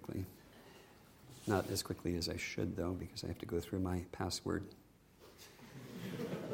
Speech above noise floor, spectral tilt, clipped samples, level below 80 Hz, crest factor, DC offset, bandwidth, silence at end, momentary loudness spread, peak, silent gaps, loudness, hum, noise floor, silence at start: 23 dB; -5 dB/octave; under 0.1%; -62 dBFS; 24 dB; under 0.1%; 16.5 kHz; 0 s; 21 LU; -18 dBFS; none; -41 LUFS; none; -63 dBFS; 0 s